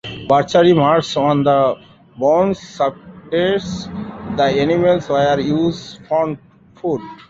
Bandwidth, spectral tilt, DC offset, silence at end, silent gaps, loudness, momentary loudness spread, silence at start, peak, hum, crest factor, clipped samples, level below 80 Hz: 7.8 kHz; -6.5 dB/octave; under 0.1%; 0.15 s; none; -17 LUFS; 14 LU; 0.05 s; 0 dBFS; none; 16 dB; under 0.1%; -48 dBFS